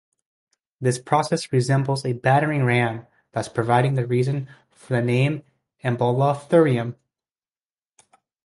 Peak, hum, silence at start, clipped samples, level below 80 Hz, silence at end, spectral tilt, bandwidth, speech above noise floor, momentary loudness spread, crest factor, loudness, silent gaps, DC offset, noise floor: -4 dBFS; none; 0.8 s; under 0.1%; -60 dBFS; 1.5 s; -6.5 dB/octave; 11.5 kHz; over 69 dB; 11 LU; 20 dB; -22 LUFS; none; under 0.1%; under -90 dBFS